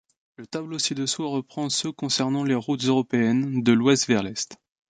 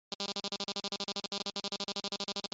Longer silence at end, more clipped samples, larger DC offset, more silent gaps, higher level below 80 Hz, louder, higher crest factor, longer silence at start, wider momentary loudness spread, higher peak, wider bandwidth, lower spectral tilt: first, 0.4 s vs 0.05 s; neither; neither; second, none vs 0.15-0.19 s; first, -64 dBFS vs -78 dBFS; first, -24 LUFS vs -37 LUFS; about the same, 18 dB vs 20 dB; first, 0.4 s vs 0.1 s; first, 11 LU vs 0 LU; first, -6 dBFS vs -20 dBFS; first, 9.6 kHz vs 8.2 kHz; first, -4 dB/octave vs -2 dB/octave